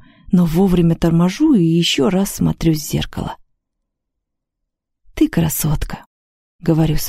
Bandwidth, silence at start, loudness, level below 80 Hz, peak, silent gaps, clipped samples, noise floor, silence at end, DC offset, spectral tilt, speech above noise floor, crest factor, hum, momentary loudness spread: 16 kHz; 0.3 s; -16 LUFS; -32 dBFS; -2 dBFS; 6.06-6.59 s; under 0.1%; -78 dBFS; 0 s; under 0.1%; -6 dB/octave; 62 dB; 16 dB; none; 12 LU